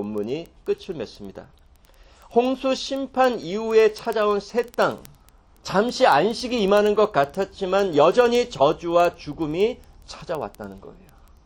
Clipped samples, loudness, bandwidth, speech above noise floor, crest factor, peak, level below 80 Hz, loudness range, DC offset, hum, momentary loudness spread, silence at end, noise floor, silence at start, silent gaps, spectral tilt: under 0.1%; -22 LUFS; 17 kHz; 31 dB; 18 dB; -4 dBFS; -52 dBFS; 5 LU; under 0.1%; none; 17 LU; 0.55 s; -53 dBFS; 0 s; none; -5 dB/octave